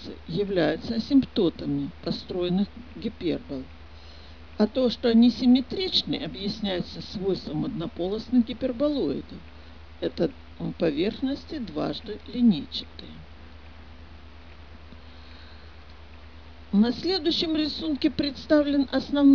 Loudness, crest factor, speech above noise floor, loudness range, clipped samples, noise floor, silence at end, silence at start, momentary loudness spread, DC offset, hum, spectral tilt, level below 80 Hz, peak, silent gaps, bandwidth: -26 LUFS; 18 dB; 22 dB; 7 LU; under 0.1%; -47 dBFS; 0 s; 0 s; 24 LU; 0.4%; none; -7 dB/octave; -48 dBFS; -8 dBFS; none; 5.4 kHz